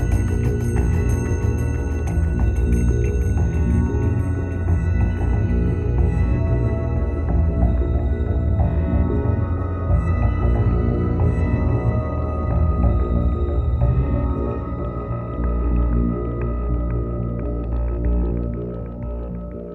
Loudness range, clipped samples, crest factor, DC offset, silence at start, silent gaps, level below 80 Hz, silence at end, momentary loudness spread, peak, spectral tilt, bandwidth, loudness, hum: 3 LU; under 0.1%; 14 dB; under 0.1%; 0 s; none; -22 dBFS; 0 s; 6 LU; -6 dBFS; -9.5 dB/octave; 8.8 kHz; -21 LUFS; none